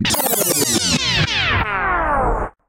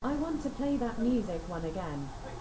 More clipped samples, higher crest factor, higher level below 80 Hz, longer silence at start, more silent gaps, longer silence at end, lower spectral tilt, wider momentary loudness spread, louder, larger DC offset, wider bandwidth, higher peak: neither; about the same, 14 dB vs 14 dB; first, -30 dBFS vs -46 dBFS; about the same, 0 s vs 0 s; neither; first, 0.2 s vs 0 s; second, -2.5 dB/octave vs -7 dB/octave; second, 3 LU vs 8 LU; first, -16 LUFS vs -34 LUFS; neither; first, 17 kHz vs 8 kHz; first, -4 dBFS vs -20 dBFS